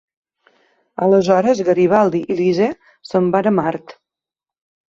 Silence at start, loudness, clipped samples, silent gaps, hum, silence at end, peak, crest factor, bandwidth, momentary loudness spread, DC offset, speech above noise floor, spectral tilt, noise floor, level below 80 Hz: 1 s; -16 LUFS; under 0.1%; none; none; 1.1 s; -2 dBFS; 16 dB; 7.6 kHz; 10 LU; under 0.1%; 73 dB; -7 dB/octave; -89 dBFS; -58 dBFS